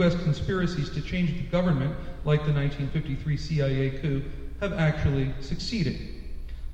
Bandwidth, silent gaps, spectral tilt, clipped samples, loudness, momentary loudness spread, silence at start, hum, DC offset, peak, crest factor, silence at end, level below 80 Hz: 8.2 kHz; none; -7.5 dB/octave; under 0.1%; -28 LUFS; 9 LU; 0 s; none; under 0.1%; -10 dBFS; 16 dB; 0 s; -36 dBFS